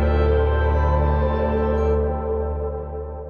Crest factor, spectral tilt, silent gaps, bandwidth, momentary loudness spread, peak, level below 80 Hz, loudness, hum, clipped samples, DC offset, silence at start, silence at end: 12 dB; -10 dB/octave; none; 4.7 kHz; 9 LU; -8 dBFS; -24 dBFS; -21 LUFS; none; under 0.1%; under 0.1%; 0 s; 0 s